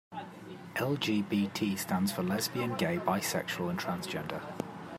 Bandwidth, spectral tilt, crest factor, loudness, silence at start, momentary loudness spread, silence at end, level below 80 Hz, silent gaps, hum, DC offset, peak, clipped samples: 16 kHz; -4.5 dB/octave; 18 dB; -33 LUFS; 0.1 s; 10 LU; 0 s; -72 dBFS; none; none; under 0.1%; -14 dBFS; under 0.1%